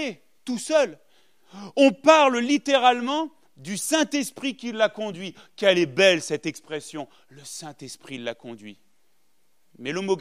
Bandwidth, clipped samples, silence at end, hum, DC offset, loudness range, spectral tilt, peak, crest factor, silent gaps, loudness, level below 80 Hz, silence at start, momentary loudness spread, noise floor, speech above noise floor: 15.5 kHz; under 0.1%; 0 s; none; 0.1%; 15 LU; -3.5 dB/octave; -2 dBFS; 22 dB; none; -22 LUFS; -78 dBFS; 0 s; 20 LU; -71 dBFS; 48 dB